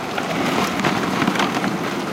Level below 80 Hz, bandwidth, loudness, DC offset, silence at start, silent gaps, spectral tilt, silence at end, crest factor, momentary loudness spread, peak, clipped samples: -52 dBFS; 17 kHz; -20 LUFS; under 0.1%; 0 s; none; -4.5 dB/octave; 0 s; 16 dB; 4 LU; -4 dBFS; under 0.1%